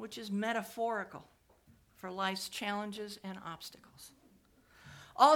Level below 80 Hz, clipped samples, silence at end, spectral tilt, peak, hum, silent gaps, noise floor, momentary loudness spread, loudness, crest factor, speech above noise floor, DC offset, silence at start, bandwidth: -74 dBFS; under 0.1%; 0 s; -4 dB/octave; -10 dBFS; none; none; -66 dBFS; 20 LU; -37 LUFS; 26 dB; 27 dB; under 0.1%; 0 s; 19 kHz